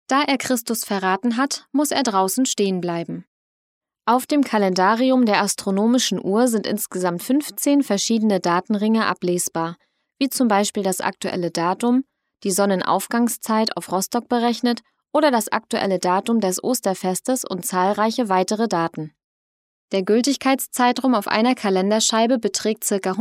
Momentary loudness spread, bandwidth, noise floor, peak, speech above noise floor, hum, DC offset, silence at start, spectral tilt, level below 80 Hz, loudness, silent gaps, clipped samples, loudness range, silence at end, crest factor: 7 LU; 16 kHz; under -90 dBFS; -2 dBFS; over 70 dB; none; under 0.1%; 0.1 s; -4 dB/octave; -72 dBFS; -20 LUFS; 3.27-3.81 s, 19.24-19.88 s; under 0.1%; 3 LU; 0 s; 20 dB